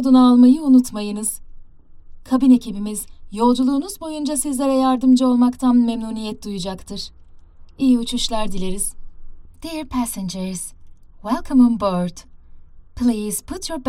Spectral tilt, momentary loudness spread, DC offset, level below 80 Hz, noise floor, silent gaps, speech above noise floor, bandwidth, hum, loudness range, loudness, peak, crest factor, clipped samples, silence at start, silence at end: -5 dB/octave; 16 LU; under 0.1%; -40 dBFS; -41 dBFS; none; 23 dB; 14.5 kHz; none; 6 LU; -18 LUFS; -4 dBFS; 16 dB; under 0.1%; 0 s; 0 s